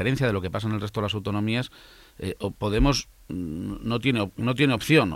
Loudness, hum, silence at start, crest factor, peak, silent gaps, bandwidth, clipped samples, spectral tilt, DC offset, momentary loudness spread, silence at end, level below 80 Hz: -26 LUFS; none; 0 s; 18 dB; -6 dBFS; none; 16 kHz; under 0.1%; -6 dB/octave; under 0.1%; 11 LU; 0 s; -38 dBFS